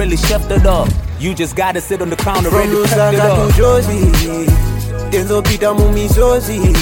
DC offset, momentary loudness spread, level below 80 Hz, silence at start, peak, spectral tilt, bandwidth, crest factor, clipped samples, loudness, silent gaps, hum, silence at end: under 0.1%; 7 LU; -18 dBFS; 0 s; 0 dBFS; -5.5 dB/octave; 17 kHz; 12 dB; under 0.1%; -13 LUFS; none; none; 0 s